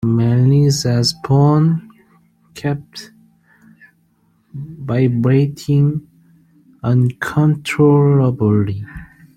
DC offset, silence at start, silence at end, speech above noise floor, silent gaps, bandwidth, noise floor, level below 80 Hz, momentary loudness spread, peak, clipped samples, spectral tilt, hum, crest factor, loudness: under 0.1%; 0 s; 0.3 s; 44 dB; none; 13.5 kHz; -58 dBFS; -48 dBFS; 18 LU; -2 dBFS; under 0.1%; -7 dB/octave; none; 14 dB; -15 LUFS